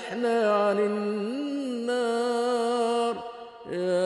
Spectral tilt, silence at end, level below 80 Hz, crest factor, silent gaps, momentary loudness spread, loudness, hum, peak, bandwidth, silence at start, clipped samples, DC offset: -5 dB/octave; 0 s; -76 dBFS; 12 dB; none; 10 LU; -27 LUFS; none; -14 dBFS; 11.5 kHz; 0 s; under 0.1%; under 0.1%